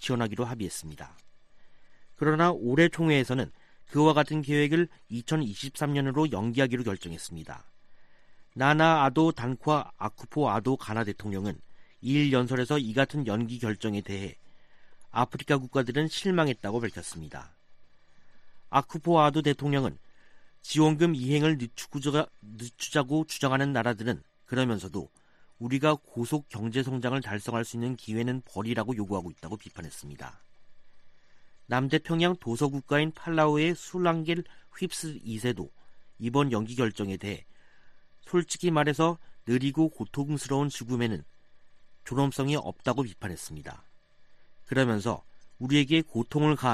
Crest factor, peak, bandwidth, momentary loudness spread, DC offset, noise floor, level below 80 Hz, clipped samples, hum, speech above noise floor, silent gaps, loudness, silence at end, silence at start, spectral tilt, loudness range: 22 dB; -8 dBFS; 14 kHz; 16 LU; under 0.1%; -53 dBFS; -60 dBFS; under 0.1%; none; 25 dB; none; -28 LUFS; 0 s; 0 s; -6 dB/octave; 6 LU